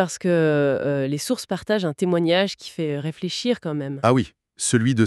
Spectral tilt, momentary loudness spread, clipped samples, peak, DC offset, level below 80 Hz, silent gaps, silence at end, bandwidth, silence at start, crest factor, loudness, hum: -5 dB/octave; 8 LU; under 0.1%; -2 dBFS; under 0.1%; -60 dBFS; none; 0 s; 13.5 kHz; 0 s; 18 dB; -22 LUFS; none